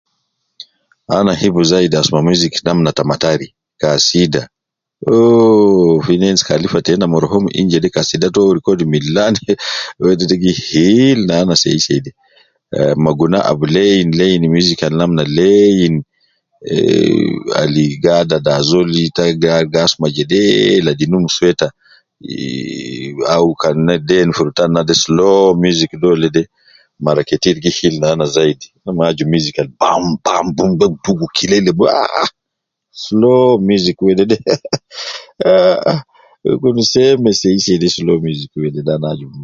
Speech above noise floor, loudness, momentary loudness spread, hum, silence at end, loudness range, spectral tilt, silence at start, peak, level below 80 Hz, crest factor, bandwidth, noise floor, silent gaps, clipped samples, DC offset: 65 dB; -13 LUFS; 10 LU; none; 0 s; 3 LU; -5 dB/octave; 1.1 s; 0 dBFS; -44 dBFS; 12 dB; 7.6 kHz; -77 dBFS; none; under 0.1%; under 0.1%